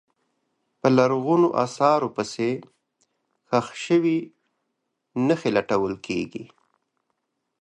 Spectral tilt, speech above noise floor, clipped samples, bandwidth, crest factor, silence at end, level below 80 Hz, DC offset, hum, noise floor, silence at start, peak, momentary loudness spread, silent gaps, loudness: -6.5 dB/octave; 56 dB; under 0.1%; 10 kHz; 22 dB; 1.15 s; -64 dBFS; under 0.1%; none; -78 dBFS; 0.85 s; -4 dBFS; 11 LU; none; -23 LUFS